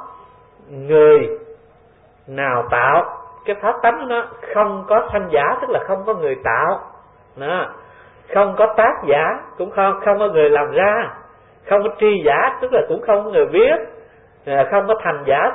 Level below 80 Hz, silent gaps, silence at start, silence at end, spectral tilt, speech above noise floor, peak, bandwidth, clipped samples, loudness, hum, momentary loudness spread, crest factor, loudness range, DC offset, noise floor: -52 dBFS; none; 0 s; 0 s; -10.5 dB/octave; 34 dB; -2 dBFS; 3.9 kHz; under 0.1%; -17 LUFS; none; 12 LU; 16 dB; 3 LU; under 0.1%; -50 dBFS